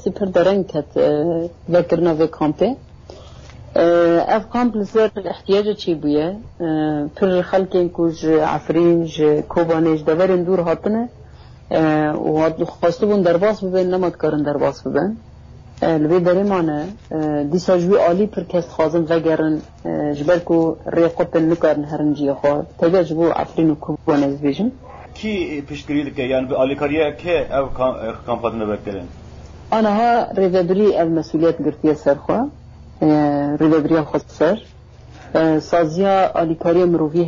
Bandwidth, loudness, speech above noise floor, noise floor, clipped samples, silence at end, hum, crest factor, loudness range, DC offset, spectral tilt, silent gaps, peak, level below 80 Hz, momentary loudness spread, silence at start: 7.4 kHz; -18 LUFS; 23 dB; -41 dBFS; under 0.1%; 0 s; none; 14 dB; 3 LU; under 0.1%; -6.5 dB/octave; none; -4 dBFS; -44 dBFS; 8 LU; 0 s